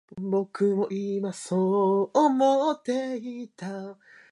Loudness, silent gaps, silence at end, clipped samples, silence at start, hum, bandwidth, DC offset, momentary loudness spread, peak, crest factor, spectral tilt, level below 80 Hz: -25 LUFS; none; 0.4 s; under 0.1%; 0.1 s; none; 11.5 kHz; under 0.1%; 15 LU; -10 dBFS; 16 dB; -6.5 dB/octave; -76 dBFS